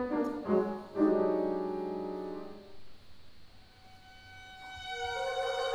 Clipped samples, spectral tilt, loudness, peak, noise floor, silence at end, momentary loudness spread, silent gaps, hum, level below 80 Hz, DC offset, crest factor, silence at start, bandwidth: under 0.1%; -5.5 dB/octave; -33 LUFS; -16 dBFS; -55 dBFS; 0 s; 21 LU; none; none; -62 dBFS; under 0.1%; 18 dB; 0 s; 12 kHz